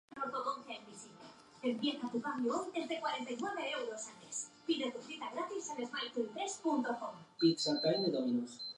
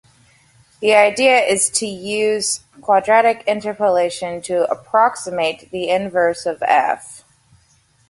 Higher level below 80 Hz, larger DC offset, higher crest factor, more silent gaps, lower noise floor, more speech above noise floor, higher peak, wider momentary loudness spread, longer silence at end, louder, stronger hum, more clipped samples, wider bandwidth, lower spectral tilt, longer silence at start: second, -86 dBFS vs -60 dBFS; neither; about the same, 20 dB vs 18 dB; neither; about the same, -57 dBFS vs -57 dBFS; second, 20 dB vs 40 dB; second, -18 dBFS vs 0 dBFS; first, 13 LU vs 9 LU; second, 0.05 s vs 0.9 s; second, -38 LUFS vs -17 LUFS; neither; neither; about the same, 11.5 kHz vs 11.5 kHz; first, -3.5 dB/octave vs -2 dB/octave; second, 0.1 s vs 0.8 s